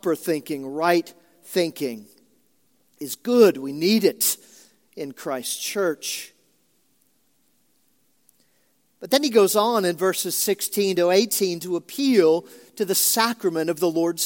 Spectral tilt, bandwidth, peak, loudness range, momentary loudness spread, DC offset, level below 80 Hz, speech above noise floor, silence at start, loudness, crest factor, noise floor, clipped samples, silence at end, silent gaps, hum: -3 dB/octave; 17 kHz; -2 dBFS; 10 LU; 13 LU; under 0.1%; -80 dBFS; 45 dB; 0.05 s; -22 LUFS; 20 dB; -67 dBFS; under 0.1%; 0 s; none; none